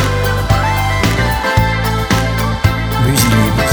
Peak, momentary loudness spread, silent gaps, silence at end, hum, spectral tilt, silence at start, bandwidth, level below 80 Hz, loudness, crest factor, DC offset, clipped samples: 0 dBFS; 4 LU; none; 0 s; none; -5 dB/octave; 0 s; over 20 kHz; -22 dBFS; -14 LUFS; 12 dB; under 0.1%; under 0.1%